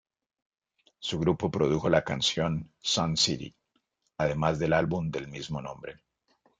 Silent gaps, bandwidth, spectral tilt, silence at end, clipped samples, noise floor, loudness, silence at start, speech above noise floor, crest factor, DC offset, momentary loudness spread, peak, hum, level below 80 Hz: none; 9.4 kHz; -4.5 dB/octave; 0.65 s; under 0.1%; -76 dBFS; -28 LUFS; 1 s; 47 dB; 20 dB; under 0.1%; 13 LU; -10 dBFS; none; -56 dBFS